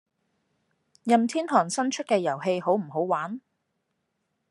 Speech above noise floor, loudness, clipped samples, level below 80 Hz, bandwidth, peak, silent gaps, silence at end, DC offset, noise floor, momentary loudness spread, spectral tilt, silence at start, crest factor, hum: 53 dB; -25 LUFS; under 0.1%; -84 dBFS; 11.5 kHz; -6 dBFS; none; 1.1 s; under 0.1%; -78 dBFS; 9 LU; -4.5 dB/octave; 1.05 s; 22 dB; none